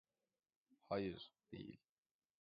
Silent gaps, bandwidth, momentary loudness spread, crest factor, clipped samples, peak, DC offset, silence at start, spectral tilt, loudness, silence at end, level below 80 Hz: none; 5.2 kHz; 14 LU; 22 dB; under 0.1%; -30 dBFS; under 0.1%; 0.9 s; -5 dB/octave; -49 LUFS; 0.65 s; -76 dBFS